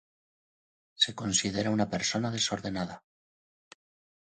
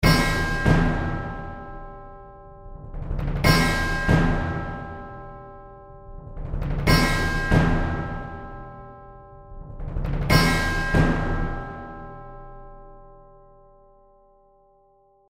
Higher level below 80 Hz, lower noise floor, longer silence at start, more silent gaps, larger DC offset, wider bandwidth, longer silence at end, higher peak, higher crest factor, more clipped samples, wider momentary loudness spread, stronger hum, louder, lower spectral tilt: second, -62 dBFS vs -30 dBFS; first, under -90 dBFS vs -59 dBFS; first, 1 s vs 0 s; neither; neither; second, 9.8 kHz vs 16 kHz; second, 1.25 s vs 2.15 s; second, -10 dBFS vs -4 dBFS; about the same, 22 dB vs 20 dB; neither; second, 9 LU vs 25 LU; neither; second, -29 LUFS vs -23 LUFS; second, -3 dB/octave vs -5.5 dB/octave